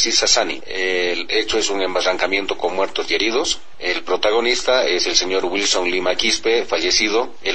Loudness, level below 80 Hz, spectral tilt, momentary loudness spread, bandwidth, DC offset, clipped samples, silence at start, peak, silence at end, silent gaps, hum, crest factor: -18 LUFS; -46 dBFS; -0.5 dB/octave; 6 LU; 9.2 kHz; 3%; under 0.1%; 0 s; -2 dBFS; 0 s; none; none; 18 dB